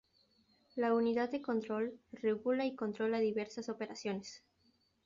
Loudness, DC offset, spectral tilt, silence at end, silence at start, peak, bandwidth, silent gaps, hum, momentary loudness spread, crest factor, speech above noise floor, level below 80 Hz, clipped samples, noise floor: -37 LUFS; under 0.1%; -4.5 dB/octave; 0.7 s; 0.75 s; -22 dBFS; 7.4 kHz; none; none; 10 LU; 16 dB; 39 dB; -80 dBFS; under 0.1%; -75 dBFS